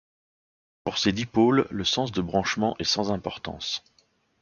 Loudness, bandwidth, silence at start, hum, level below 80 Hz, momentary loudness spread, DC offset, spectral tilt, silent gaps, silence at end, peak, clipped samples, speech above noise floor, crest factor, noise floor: -26 LUFS; 7.2 kHz; 0.85 s; none; -52 dBFS; 11 LU; under 0.1%; -4.5 dB/octave; none; 0.65 s; -8 dBFS; under 0.1%; 41 dB; 18 dB; -66 dBFS